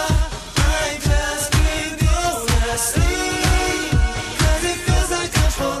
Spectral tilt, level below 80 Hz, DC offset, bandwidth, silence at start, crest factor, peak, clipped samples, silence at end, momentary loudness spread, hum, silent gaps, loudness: -4 dB/octave; -22 dBFS; under 0.1%; 15 kHz; 0 s; 14 dB; -4 dBFS; under 0.1%; 0 s; 2 LU; none; none; -19 LUFS